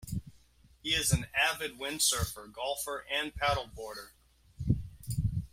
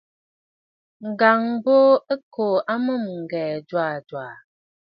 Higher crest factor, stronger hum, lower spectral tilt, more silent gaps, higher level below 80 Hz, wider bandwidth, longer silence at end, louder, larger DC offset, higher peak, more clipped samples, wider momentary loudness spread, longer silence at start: about the same, 22 dB vs 20 dB; neither; second, -3 dB/octave vs -9 dB/octave; second, none vs 2.23-2.31 s; first, -48 dBFS vs -76 dBFS; first, 16.5 kHz vs 5.4 kHz; second, 0.05 s vs 0.55 s; second, -32 LUFS vs -21 LUFS; neither; second, -12 dBFS vs -2 dBFS; neither; second, 14 LU vs 17 LU; second, 0 s vs 1 s